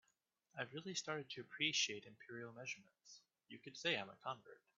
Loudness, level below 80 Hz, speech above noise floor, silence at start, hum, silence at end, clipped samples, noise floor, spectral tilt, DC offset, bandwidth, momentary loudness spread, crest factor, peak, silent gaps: -44 LUFS; under -90 dBFS; 37 dB; 0.55 s; none; 0.2 s; under 0.1%; -84 dBFS; -1 dB/octave; under 0.1%; 7.4 kHz; 22 LU; 24 dB; -22 dBFS; none